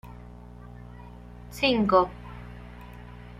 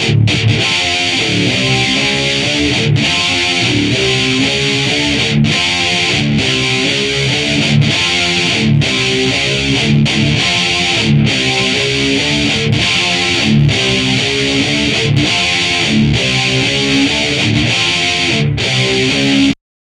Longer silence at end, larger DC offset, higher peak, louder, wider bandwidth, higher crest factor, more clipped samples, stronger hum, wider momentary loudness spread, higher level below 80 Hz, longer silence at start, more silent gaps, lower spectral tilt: about the same, 0.4 s vs 0.35 s; neither; second, -6 dBFS vs 0 dBFS; second, -24 LUFS vs -11 LUFS; first, 15.5 kHz vs 12 kHz; first, 24 dB vs 12 dB; neither; first, 60 Hz at -45 dBFS vs none; first, 24 LU vs 1 LU; second, -46 dBFS vs -34 dBFS; about the same, 0.05 s vs 0 s; neither; first, -6 dB/octave vs -4 dB/octave